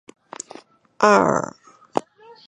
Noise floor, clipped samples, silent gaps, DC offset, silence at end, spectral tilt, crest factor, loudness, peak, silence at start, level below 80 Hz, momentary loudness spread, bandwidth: -45 dBFS; under 0.1%; none; under 0.1%; 0.45 s; -4.5 dB/octave; 22 dB; -19 LUFS; 0 dBFS; 1 s; -62 dBFS; 22 LU; 11 kHz